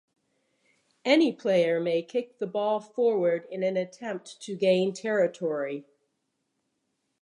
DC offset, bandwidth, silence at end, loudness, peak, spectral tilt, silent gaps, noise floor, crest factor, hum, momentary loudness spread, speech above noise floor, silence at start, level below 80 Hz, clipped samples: under 0.1%; 11 kHz; 1.4 s; -27 LUFS; -10 dBFS; -5.5 dB/octave; none; -78 dBFS; 20 dB; none; 12 LU; 52 dB; 1.05 s; -84 dBFS; under 0.1%